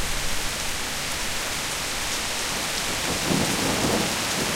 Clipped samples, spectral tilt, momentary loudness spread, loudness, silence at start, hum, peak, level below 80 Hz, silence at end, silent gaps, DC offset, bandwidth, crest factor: under 0.1%; -2 dB/octave; 4 LU; -24 LUFS; 0 s; none; -8 dBFS; -38 dBFS; 0 s; none; under 0.1%; 16 kHz; 18 dB